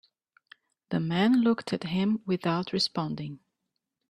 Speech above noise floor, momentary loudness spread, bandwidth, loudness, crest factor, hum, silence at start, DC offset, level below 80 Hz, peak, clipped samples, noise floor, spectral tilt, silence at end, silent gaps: 56 dB; 11 LU; 11 kHz; -28 LUFS; 18 dB; none; 0.9 s; under 0.1%; -68 dBFS; -10 dBFS; under 0.1%; -83 dBFS; -6 dB/octave; 0.75 s; none